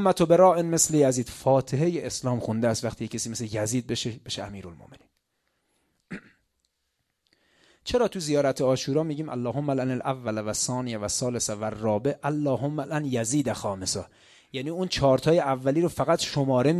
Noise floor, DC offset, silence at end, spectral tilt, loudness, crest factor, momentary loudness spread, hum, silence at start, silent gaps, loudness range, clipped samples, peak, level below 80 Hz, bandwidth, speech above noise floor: -77 dBFS; under 0.1%; 0 s; -5 dB/octave; -26 LUFS; 20 dB; 12 LU; none; 0 s; none; 9 LU; under 0.1%; -6 dBFS; -54 dBFS; 14 kHz; 52 dB